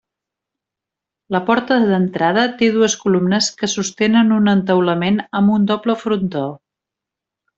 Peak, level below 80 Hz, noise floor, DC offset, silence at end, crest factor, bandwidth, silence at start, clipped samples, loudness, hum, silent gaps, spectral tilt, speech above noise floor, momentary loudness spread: -2 dBFS; -58 dBFS; -85 dBFS; under 0.1%; 1 s; 14 dB; 8 kHz; 1.3 s; under 0.1%; -16 LUFS; none; none; -5 dB/octave; 69 dB; 6 LU